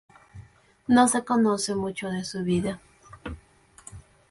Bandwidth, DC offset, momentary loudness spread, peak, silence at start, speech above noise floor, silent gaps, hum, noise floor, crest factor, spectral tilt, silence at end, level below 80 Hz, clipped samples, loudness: 11.5 kHz; under 0.1%; 25 LU; -8 dBFS; 0.35 s; 32 dB; none; none; -56 dBFS; 18 dB; -4.5 dB/octave; 0.3 s; -52 dBFS; under 0.1%; -24 LUFS